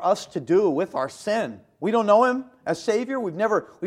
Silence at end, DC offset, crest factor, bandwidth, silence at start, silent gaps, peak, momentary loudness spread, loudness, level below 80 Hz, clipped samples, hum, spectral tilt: 0 s; under 0.1%; 18 dB; 13 kHz; 0 s; none; -4 dBFS; 10 LU; -23 LUFS; -68 dBFS; under 0.1%; none; -5.5 dB/octave